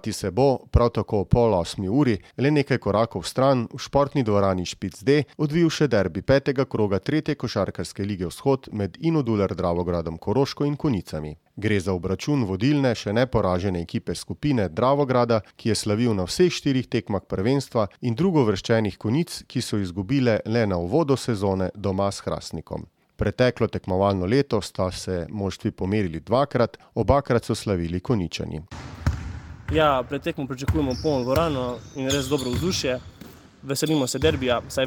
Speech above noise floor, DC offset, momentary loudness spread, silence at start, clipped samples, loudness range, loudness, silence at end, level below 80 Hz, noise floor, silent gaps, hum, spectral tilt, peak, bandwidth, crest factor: 23 dB; under 0.1%; 8 LU; 0.05 s; under 0.1%; 3 LU; -24 LUFS; 0 s; -42 dBFS; -46 dBFS; none; none; -6 dB/octave; -4 dBFS; 19 kHz; 20 dB